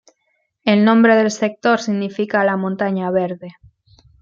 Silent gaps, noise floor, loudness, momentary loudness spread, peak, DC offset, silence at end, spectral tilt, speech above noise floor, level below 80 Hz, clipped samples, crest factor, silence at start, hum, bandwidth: none; -68 dBFS; -17 LUFS; 10 LU; -2 dBFS; under 0.1%; 0.7 s; -6 dB/octave; 52 dB; -62 dBFS; under 0.1%; 16 dB; 0.65 s; none; 7.6 kHz